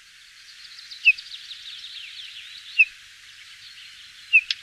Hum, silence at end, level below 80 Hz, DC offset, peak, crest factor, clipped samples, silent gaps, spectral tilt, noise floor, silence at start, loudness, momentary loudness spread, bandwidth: none; 0.05 s; -72 dBFS; under 0.1%; -6 dBFS; 20 dB; under 0.1%; none; 4 dB/octave; -49 dBFS; 0.8 s; -19 LUFS; 24 LU; 14 kHz